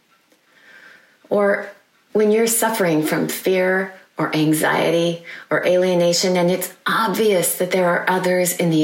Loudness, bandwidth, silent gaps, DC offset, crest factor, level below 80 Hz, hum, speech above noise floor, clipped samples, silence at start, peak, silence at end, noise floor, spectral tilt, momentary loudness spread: -18 LUFS; 16.5 kHz; none; under 0.1%; 16 dB; -70 dBFS; none; 40 dB; under 0.1%; 1.3 s; -4 dBFS; 0 s; -58 dBFS; -4 dB/octave; 7 LU